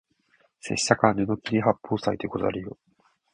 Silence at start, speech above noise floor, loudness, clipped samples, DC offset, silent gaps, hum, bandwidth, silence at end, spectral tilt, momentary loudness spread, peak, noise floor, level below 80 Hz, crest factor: 0.65 s; 41 dB; -25 LUFS; under 0.1%; under 0.1%; none; none; 10.5 kHz; 0.6 s; -5 dB/octave; 13 LU; -2 dBFS; -66 dBFS; -56 dBFS; 26 dB